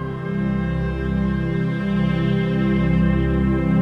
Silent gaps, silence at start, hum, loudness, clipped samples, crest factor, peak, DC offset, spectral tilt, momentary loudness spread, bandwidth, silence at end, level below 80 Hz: none; 0 s; none; -21 LUFS; under 0.1%; 12 dB; -8 dBFS; under 0.1%; -9.5 dB/octave; 5 LU; 5.8 kHz; 0 s; -30 dBFS